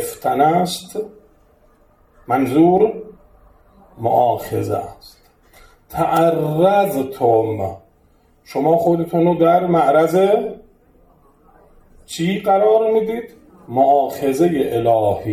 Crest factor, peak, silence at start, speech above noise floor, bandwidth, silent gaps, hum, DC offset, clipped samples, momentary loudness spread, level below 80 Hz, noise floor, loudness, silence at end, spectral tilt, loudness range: 16 dB; -2 dBFS; 0 s; 39 dB; 17 kHz; none; none; under 0.1%; under 0.1%; 14 LU; -52 dBFS; -55 dBFS; -17 LUFS; 0 s; -6.5 dB/octave; 4 LU